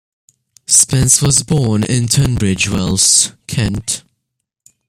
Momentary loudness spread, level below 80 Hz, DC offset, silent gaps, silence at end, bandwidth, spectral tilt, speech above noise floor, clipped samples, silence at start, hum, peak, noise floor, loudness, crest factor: 10 LU; -36 dBFS; under 0.1%; none; 0.9 s; over 20 kHz; -3.5 dB/octave; 61 dB; under 0.1%; 0.7 s; none; 0 dBFS; -74 dBFS; -12 LUFS; 16 dB